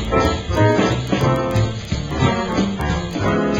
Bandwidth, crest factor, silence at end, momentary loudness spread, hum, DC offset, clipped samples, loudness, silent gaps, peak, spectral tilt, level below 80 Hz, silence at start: 15.5 kHz; 14 dB; 0 s; 6 LU; none; under 0.1%; under 0.1%; -19 LUFS; none; -4 dBFS; -6.5 dB/octave; -30 dBFS; 0 s